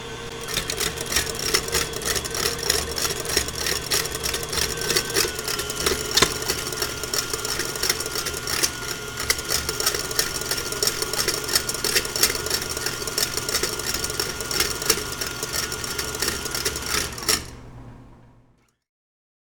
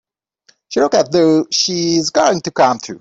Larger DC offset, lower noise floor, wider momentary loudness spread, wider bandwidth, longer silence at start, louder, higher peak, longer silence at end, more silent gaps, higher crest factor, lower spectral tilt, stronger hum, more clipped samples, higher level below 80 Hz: neither; first, -60 dBFS vs -56 dBFS; about the same, 5 LU vs 3 LU; first, over 20 kHz vs 8 kHz; second, 0 s vs 0.7 s; second, -23 LUFS vs -14 LUFS; about the same, 0 dBFS vs -2 dBFS; first, 1.15 s vs 0 s; neither; first, 26 dB vs 14 dB; second, -1.5 dB/octave vs -3.5 dB/octave; neither; neither; first, -42 dBFS vs -56 dBFS